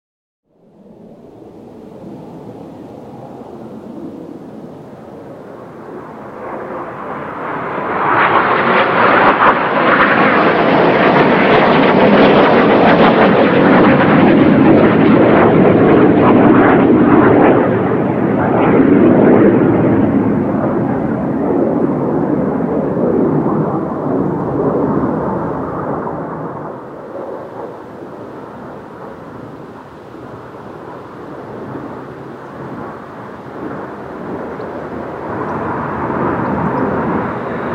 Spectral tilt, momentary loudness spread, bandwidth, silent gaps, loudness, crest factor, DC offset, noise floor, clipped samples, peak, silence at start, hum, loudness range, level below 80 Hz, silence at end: -9 dB/octave; 23 LU; 6 kHz; none; -11 LUFS; 14 dB; under 0.1%; -44 dBFS; under 0.1%; 0 dBFS; 1.45 s; none; 22 LU; -44 dBFS; 0 s